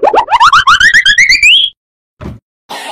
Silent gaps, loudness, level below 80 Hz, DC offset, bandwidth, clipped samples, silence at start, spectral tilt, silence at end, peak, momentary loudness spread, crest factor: 1.77-2.17 s, 2.42-2.69 s; -4 LUFS; -36 dBFS; under 0.1%; 18 kHz; 0.3%; 0 s; 0 dB/octave; 0 s; 0 dBFS; 7 LU; 8 dB